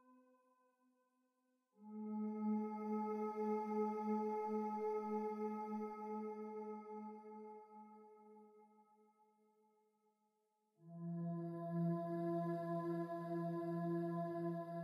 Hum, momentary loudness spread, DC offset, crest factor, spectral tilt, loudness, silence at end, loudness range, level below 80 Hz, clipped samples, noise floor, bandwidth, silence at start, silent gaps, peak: none; 15 LU; under 0.1%; 16 dB; -10 dB/octave; -44 LUFS; 0 s; 14 LU; under -90 dBFS; under 0.1%; -84 dBFS; 12.5 kHz; 0.1 s; none; -30 dBFS